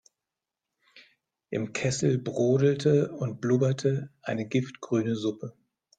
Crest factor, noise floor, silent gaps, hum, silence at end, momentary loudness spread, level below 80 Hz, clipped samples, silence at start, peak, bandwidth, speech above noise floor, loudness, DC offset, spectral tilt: 18 dB; -88 dBFS; none; none; 0.5 s; 11 LU; -66 dBFS; under 0.1%; 0.95 s; -10 dBFS; 9.2 kHz; 62 dB; -27 LUFS; under 0.1%; -6.5 dB/octave